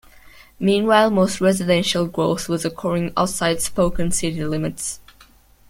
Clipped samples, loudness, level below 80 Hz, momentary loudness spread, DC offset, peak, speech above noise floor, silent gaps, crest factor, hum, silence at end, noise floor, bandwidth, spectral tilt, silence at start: under 0.1%; -20 LUFS; -42 dBFS; 9 LU; under 0.1%; -2 dBFS; 32 dB; none; 18 dB; none; 0.7 s; -51 dBFS; 16.5 kHz; -4.5 dB/octave; 0.25 s